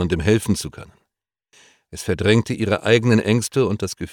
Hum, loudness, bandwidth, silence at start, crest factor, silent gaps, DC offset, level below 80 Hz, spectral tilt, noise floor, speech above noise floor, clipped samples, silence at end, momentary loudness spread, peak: none; -19 LUFS; 18 kHz; 0 s; 18 dB; none; under 0.1%; -44 dBFS; -5.5 dB/octave; -80 dBFS; 61 dB; under 0.1%; 0 s; 11 LU; -2 dBFS